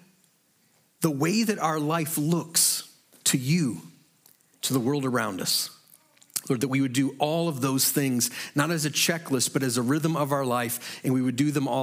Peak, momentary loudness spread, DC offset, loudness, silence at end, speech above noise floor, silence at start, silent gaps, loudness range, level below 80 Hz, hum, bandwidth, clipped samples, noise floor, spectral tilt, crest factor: -6 dBFS; 7 LU; under 0.1%; -25 LUFS; 0 s; 40 dB; 1 s; none; 3 LU; -76 dBFS; none; 16.5 kHz; under 0.1%; -65 dBFS; -4 dB/octave; 20 dB